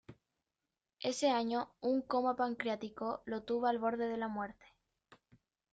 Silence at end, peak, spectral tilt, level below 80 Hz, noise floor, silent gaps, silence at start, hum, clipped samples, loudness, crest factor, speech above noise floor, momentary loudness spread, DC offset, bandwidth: 0.6 s; -20 dBFS; -4 dB/octave; -74 dBFS; under -90 dBFS; none; 0.1 s; none; under 0.1%; -36 LUFS; 18 dB; over 54 dB; 8 LU; under 0.1%; 8.8 kHz